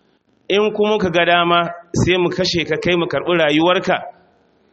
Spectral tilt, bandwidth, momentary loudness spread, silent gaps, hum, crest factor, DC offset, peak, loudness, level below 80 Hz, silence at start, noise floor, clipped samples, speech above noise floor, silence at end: -5 dB/octave; 8.2 kHz; 6 LU; none; none; 16 dB; under 0.1%; 0 dBFS; -16 LUFS; -44 dBFS; 0.5 s; -56 dBFS; under 0.1%; 40 dB; 0.6 s